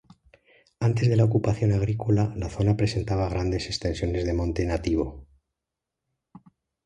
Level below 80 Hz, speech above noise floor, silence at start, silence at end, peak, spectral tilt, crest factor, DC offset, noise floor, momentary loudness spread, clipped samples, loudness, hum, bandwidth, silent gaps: -38 dBFS; 62 dB; 0.8 s; 0.45 s; -8 dBFS; -7 dB/octave; 18 dB; under 0.1%; -86 dBFS; 6 LU; under 0.1%; -25 LUFS; none; 9.4 kHz; none